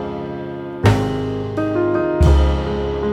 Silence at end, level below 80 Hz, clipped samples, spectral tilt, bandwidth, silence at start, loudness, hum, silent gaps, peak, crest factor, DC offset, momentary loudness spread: 0 s; -22 dBFS; under 0.1%; -7.5 dB/octave; 11.5 kHz; 0 s; -19 LUFS; none; none; -2 dBFS; 16 dB; under 0.1%; 13 LU